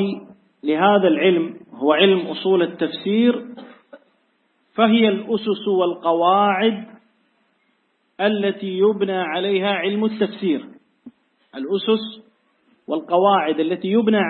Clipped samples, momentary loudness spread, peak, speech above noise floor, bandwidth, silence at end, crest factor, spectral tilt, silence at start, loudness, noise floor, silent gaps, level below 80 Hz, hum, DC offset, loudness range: under 0.1%; 12 LU; -2 dBFS; 47 dB; 4.4 kHz; 0 s; 18 dB; -10.5 dB/octave; 0 s; -19 LUFS; -66 dBFS; none; -72 dBFS; none; under 0.1%; 4 LU